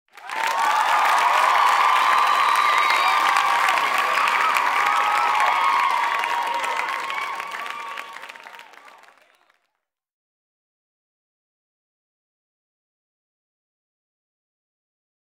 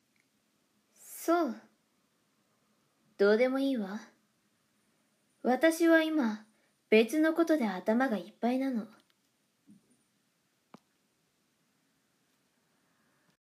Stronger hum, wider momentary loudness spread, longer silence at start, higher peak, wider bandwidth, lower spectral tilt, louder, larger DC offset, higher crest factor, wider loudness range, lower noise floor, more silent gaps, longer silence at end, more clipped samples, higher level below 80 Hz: neither; about the same, 14 LU vs 15 LU; second, 0.2 s vs 1.05 s; first, -2 dBFS vs -12 dBFS; about the same, 16 kHz vs 15.5 kHz; second, 1 dB/octave vs -5 dB/octave; first, -19 LUFS vs -29 LUFS; neither; about the same, 20 dB vs 22 dB; first, 15 LU vs 10 LU; first, -79 dBFS vs -75 dBFS; neither; first, 6.6 s vs 4.55 s; neither; first, -80 dBFS vs under -90 dBFS